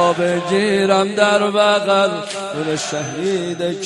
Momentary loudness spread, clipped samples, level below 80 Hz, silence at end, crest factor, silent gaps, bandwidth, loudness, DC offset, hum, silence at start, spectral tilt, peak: 8 LU; under 0.1%; -60 dBFS; 0 s; 14 dB; none; 11.5 kHz; -17 LUFS; under 0.1%; none; 0 s; -4 dB/octave; -2 dBFS